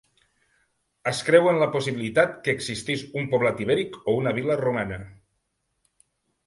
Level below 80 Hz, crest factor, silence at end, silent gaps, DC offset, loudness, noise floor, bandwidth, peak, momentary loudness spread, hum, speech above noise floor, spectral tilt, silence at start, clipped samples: -58 dBFS; 24 dB; 1.35 s; none; under 0.1%; -24 LUFS; -75 dBFS; 11.5 kHz; -2 dBFS; 10 LU; none; 52 dB; -5 dB/octave; 1.05 s; under 0.1%